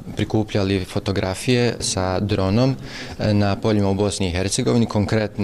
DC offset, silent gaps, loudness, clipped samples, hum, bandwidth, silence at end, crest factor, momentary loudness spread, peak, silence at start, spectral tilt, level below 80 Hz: 0.2%; none; -21 LUFS; under 0.1%; none; 13.5 kHz; 0 s; 12 dB; 4 LU; -8 dBFS; 0 s; -5.5 dB/octave; -42 dBFS